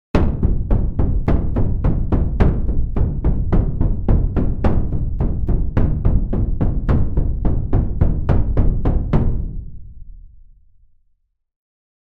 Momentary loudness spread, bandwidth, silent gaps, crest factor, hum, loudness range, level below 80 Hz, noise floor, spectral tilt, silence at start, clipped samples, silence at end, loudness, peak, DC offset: 4 LU; 4.4 kHz; none; 16 dB; none; 3 LU; -20 dBFS; -63 dBFS; -10.5 dB/octave; 0.15 s; under 0.1%; 1.75 s; -20 LUFS; 0 dBFS; under 0.1%